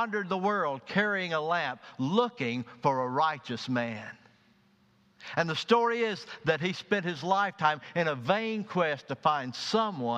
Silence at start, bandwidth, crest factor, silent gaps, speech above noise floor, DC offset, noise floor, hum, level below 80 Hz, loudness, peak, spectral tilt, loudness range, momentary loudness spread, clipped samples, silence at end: 0 s; 9.6 kHz; 20 dB; none; 36 dB; under 0.1%; -65 dBFS; none; -74 dBFS; -29 LUFS; -10 dBFS; -5.5 dB/octave; 3 LU; 7 LU; under 0.1%; 0 s